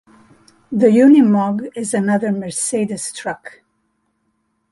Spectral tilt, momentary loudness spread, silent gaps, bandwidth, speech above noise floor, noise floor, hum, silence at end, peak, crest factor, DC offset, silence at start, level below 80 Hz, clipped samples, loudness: -5.5 dB/octave; 15 LU; none; 11.5 kHz; 52 dB; -67 dBFS; none; 1.2 s; -2 dBFS; 16 dB; under 0.1%; 0.7 s; -62 dBFS; under 0.1%; -16 LUFS